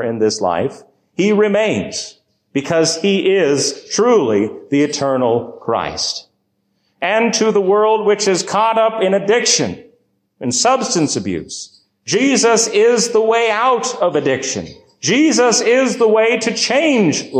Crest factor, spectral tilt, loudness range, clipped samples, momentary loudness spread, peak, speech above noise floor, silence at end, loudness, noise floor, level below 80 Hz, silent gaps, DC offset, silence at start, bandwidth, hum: 12 dB; -3.5 dB/octave; 3 LU; under 0.1%; 11 LU; -2 dBFS; 51 dB; 0 s; -15 LUFS; -66 dBFS; -54 dBFS; none; under 0.1%; 0 s; 11.5 kHz; none